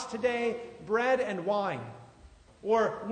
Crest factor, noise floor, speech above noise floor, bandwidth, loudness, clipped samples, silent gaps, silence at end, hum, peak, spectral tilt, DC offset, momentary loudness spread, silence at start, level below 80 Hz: 16 dB; -56 dBFS; 26 dB; 9.6 kHz; -30 LUFS; under 0.1%; none; 0 s; none; -14 dBFS; -5 dB/octave; under 0.1%; 13 LU; 0 s; -64 dBFS